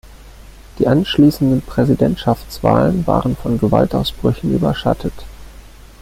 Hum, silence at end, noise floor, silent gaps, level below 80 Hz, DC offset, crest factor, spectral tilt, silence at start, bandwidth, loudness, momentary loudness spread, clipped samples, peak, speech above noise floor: none; 0.5 s; -38 dBFS; none; -34 dBFS; under 0.1%; 16 dB; -7.5 dB/octave; 0.05 s; 16 kHz; -16 LUFS; 7 LU; under 0.1%; 0 dBFS; 23 dB